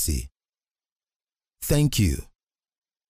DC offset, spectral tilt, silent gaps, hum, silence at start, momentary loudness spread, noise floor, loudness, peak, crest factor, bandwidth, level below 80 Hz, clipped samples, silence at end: under 0.1%; -5 dB/octave; 0.92-0.96 s, 1.16-1.20 s; none; 0 s; 13 LU; under -90 dBFS; -25 LUFS; -8 dBFS; 18 dB; 16 kHz; -36 dBFS; under 0.1%; 0.85 s